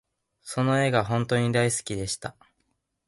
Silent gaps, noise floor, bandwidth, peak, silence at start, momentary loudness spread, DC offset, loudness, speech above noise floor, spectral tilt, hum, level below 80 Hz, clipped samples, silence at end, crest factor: none; -75 dBFS; 12 kHz; -8 dBFS; 0.45 s; 11 LU; under 0.1%; -25 LUFS; 50 dB; -5 dB/octave; none; -56 dBFS; under 0.1%; 0.75 s; 18 dB